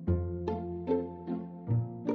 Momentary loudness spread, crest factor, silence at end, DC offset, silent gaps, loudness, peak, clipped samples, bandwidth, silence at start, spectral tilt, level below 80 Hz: 6 LU; 16 dB; 0 s; under 0.1%; none; -34 LUFS; -18 dBFS; under 0.1%; 6.2 kHz; 0 s; -11 dB/octave; -48 dBFS